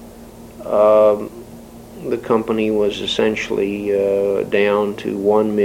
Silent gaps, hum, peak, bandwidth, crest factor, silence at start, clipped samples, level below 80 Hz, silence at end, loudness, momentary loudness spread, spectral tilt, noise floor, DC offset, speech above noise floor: none; none; -2 dBFS; 16.5 kHz; 16 dB; 0 s; under 0.1%; -48 dBFS; 0 s; -17 LUFS; 18 LU; -5.5 dB/octave; -38 dBFS; under 0.1%; 22 dB